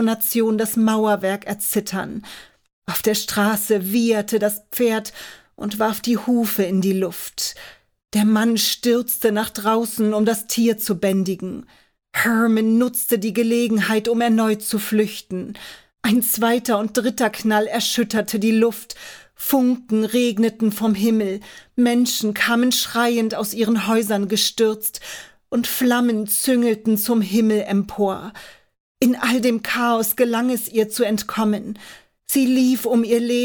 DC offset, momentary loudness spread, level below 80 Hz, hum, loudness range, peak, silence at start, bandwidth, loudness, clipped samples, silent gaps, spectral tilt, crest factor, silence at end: under 0.1%; 11 LU; -60 dBFS; none; 2 LU; -4 dBFS; 0 s; over 20 kHz; -19 LUFS; under 0.1%; 2.73-2.82 s, 28.80-28.95 s; -4 dB/octave; 16 dB; 0 s